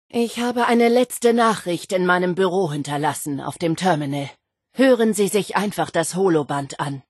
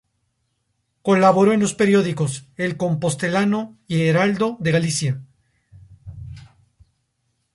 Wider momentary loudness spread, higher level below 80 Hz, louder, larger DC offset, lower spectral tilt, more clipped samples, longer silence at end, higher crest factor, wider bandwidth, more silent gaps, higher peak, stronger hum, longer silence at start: second, 10 LU vs 13 LU; second, -66 dBFS vs -54 dBFS; about the same, -20 LUFS vs -19 LUFS; neither; about the same, -5 dB/octave vs -5.5 dB/octave; neither; second, 0.1 s vs 1.15 s; about the same, 16 dB vs 18 dB; about the same, 12.5 kHz vs 11.5 kHz; neither; about the same, -4 dBFS vs -2 dBFS; neither; second, 0.15 s vs 1.05 s